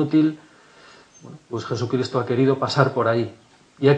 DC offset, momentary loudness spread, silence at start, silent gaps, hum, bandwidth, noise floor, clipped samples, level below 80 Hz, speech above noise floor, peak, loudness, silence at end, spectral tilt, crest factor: under 0.1%; 12 LU; 0 s; none; none; 9 kHz; -49 dBFS; under 0.1%; -68 dBFS; 28 dB; -2 dBFS; -22 LUFS; 0 s; -7 dB/octave; 20 dB